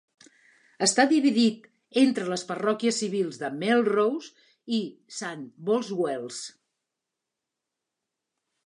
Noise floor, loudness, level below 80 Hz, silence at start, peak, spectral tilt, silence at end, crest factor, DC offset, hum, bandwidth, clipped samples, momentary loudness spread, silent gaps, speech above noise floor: -86 dBFS; -26 LUFS; -80 dBFS; 0.8 s; -8 dBFS; -3.5 dB/octave; 2.15 s; 20 dB; under 0.1%; none; 11 kHz; under 0.1%; 15 LU; none; 60 dB